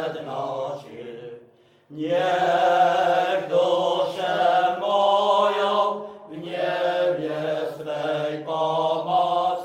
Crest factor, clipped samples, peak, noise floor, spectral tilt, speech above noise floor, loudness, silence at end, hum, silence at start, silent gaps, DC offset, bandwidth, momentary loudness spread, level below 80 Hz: 14 dB; under 0.1%; -8 dBFS; -55 dBFS; -5 dB/octave; 31 dB; -22 LUFS; 0 s; none; 0 s; none; under 0.1%; 12.5 kHz; 15 LU; -74 dBFS